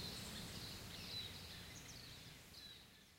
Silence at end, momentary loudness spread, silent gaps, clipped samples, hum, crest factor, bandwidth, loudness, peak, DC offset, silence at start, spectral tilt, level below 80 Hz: 0 s; 9 LU; none; under 0.1%; none; 16 dB; 16 kHz; -51 LUFS; -38 dBFS; under 0.1%; 0 s; -3 dB/octave; -66 dBFS